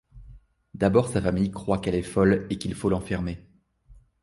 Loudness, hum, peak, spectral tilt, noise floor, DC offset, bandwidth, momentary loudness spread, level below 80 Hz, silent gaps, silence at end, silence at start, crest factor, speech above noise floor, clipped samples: -25 LUFS; none; -6 dBFS; -7 dB/octave; -54 dBFS; under 0.1%; 11.5 kHz; 9 LU; -44 dBFS; none; 0.3 s; 0.15 s; 20 dB; 30 dB; under 0.1%